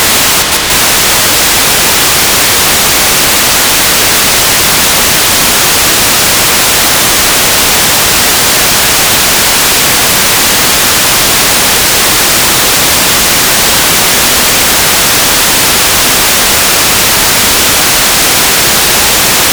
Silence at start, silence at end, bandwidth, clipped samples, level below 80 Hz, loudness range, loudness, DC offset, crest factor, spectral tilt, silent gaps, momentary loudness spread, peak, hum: 0 s; 0 s; over 20 kHz; 9%; -28 dBFS; 0 LU; -4 LUFS; under 0.1%; 6 dB; -0.5 dB/octave; none; 0 LU; 0 dBFS; none